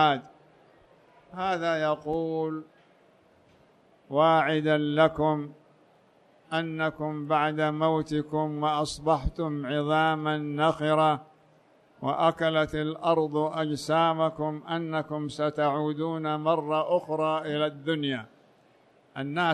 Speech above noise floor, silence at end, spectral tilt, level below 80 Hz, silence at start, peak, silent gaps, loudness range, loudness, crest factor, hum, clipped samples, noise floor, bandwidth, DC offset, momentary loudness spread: 34 dB; 0 s; -6 dB/octave; -52 dBFS; 0 s; -8 dBFS; none; 3 LU; -27 LUFS; 18 dB; none; under 0.1%; -61 dBFS; 12 kHz; under 0.1%; 9 LU